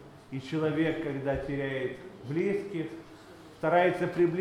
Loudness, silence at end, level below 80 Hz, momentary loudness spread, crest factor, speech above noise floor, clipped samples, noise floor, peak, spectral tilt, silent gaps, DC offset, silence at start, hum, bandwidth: -30 LUFS; 0 s; -56 dBFS; 18 LU; 18 dB; 21 dB; under 0.1%; -50 dBFS; -12 dBFS; -7.5 dB/octave; none; under 0.1%; 0 s; none; 12 kHz